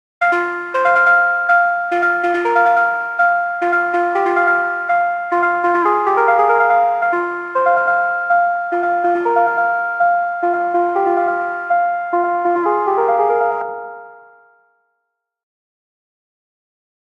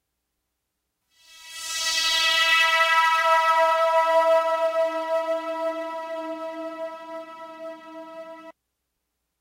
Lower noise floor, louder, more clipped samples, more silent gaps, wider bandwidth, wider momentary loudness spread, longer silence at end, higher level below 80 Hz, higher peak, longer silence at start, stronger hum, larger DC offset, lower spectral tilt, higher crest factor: second, -74 dBFS vs -80 dBFS; first, -15 LUFS vs -21 LUFS; neither; neither; second, 7.6 kHz vs 16 kHz; second, 5 LU vs 22 LU; first, 2.85 s vs 0.9 s; second, -74 dBFS vs -68 dBFS; first, 0 dBFS vs -8 dBFS; second, 0.2 s vs 1.35 s; neither; neither; first, -5 dB/octave vs 1 dB/octave; about the same, 16 dB vs 18 dB